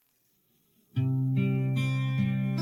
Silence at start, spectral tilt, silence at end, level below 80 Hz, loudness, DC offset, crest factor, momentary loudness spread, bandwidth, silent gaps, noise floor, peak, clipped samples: 0.95 s; -8 dB/octave; 0 s; -70 dBFS; -29 LUFS; under 0.1%; 12 dB; 3 LU; 7.4 kHz; none; -71 dBFS; -16 dBFS; under 0.1%